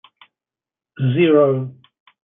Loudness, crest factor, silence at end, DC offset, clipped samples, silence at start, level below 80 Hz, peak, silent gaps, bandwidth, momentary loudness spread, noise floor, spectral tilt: -17 LUFS; 16 dB; 0.65 s; under 0.1%; under 0.1%; 1 s; -68 dBFS; -4 dBFS; none; 3.8 kHz; 12 LU; under -90 dBFS; -12 dB/octave